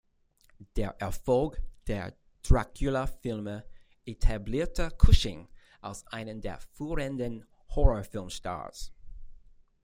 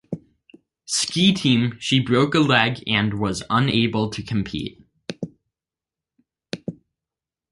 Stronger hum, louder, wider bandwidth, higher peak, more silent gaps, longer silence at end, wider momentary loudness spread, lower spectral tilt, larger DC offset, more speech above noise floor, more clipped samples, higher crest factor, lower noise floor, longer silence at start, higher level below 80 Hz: neither; second, -32 LUFS vs -20 LUFS; first, 15.5 kHz vs 11.5 kHz; second, -6 dBFS vs -2 dBFS; neither; second, 0.5 s vs 0.8 s; about the same, 16 LU vs 18 LU; first, -6 dB/octave vs -4.5 dB/octave; neither; second, 38 dB vs 69 dB; neither; about the same, 24 dB vs 22 dB; second, -65 dBFS vs -89 dBFS; first, 0.6 s vs 0.1 s; first, -32 dBFS vs -52 dBFS